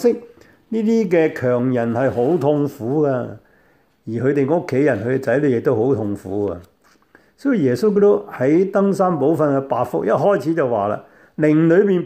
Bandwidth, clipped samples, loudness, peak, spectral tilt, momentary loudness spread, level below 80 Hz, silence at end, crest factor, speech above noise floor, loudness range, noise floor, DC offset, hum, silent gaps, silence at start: 15 kHz; under 0.1%; -18 LUFS; -4 dBFS; -8.5 dB/octave; 9 LU; -60 dBFS; 0 s; 14 dB; 40 dB; 3 LU; -57 dBFS; under 0.1%; none; none; 0 s